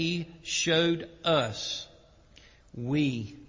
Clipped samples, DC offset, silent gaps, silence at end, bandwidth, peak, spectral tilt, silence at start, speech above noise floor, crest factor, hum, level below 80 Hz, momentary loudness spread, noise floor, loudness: under 0.1%; under 0.1%; none; 0.05 s; 7.6 kHz; -14 dBFS; -4 dB/octave; 0 s; 27 dB; 18 dB; none; -60 dBFS; 13 LU; -56 dBFS; -29 LUFS